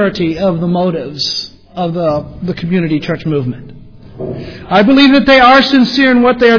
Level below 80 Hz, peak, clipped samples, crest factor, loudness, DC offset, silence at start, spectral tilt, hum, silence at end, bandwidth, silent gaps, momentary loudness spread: -40 dBFS; 0 dBFS; 0.2%; 12 dB; -11 LUFS; under 0.1%; 0 s; -6 dB/octave; none; 0 s; 5.4 kHz; none; 18 LU